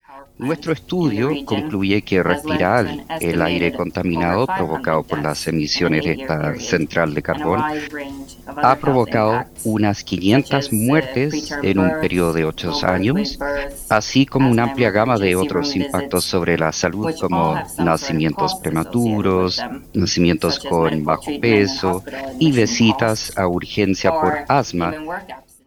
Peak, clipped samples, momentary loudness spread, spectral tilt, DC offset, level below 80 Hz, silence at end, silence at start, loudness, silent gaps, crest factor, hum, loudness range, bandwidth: 0 dBFS; under 0.1%; 7 LU; -5.5 dB/octave; under 0.1%; -42 dBFS; 0.25 s; 0.1 s; -19 LUFS; none; 18 dB; none; 2 LU; 20 kHz